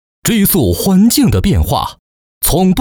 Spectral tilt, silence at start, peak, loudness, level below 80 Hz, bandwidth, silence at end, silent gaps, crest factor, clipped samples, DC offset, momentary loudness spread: -5 dB/octave; 0.25 s; -2 dBFS; -12 LUFS; -24 dBFS; over 20 kHz; 0 s; 1.99-2.41 s; 10 dB; under 0.1%; under 0.1%; 7 LU